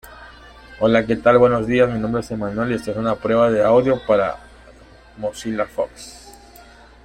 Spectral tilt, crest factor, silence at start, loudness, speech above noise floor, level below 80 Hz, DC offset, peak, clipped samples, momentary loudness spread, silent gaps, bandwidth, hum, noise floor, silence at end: -6.5 dB/octave; 18 dB; 0.05 s; -19 LUFS; 27 dB; -46 dBFS; under 0.1%; -2 dBFS; under 0.1%; 13 LU; none; 15 kHz; none; -45 dBFS; 0.75 s